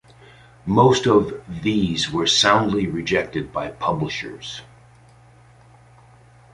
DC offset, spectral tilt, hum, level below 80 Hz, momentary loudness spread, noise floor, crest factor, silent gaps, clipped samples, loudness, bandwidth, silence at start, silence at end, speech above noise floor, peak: under 0.1%; -4.5 dB/octave; none; -48 dBFS; 16 LU; -50 dBFS; 20 dB; none; under 0.1%; -20 LUFS; 11.5 kHz; 0.65 s; 1.9 s; 30 dB; -2 dBFS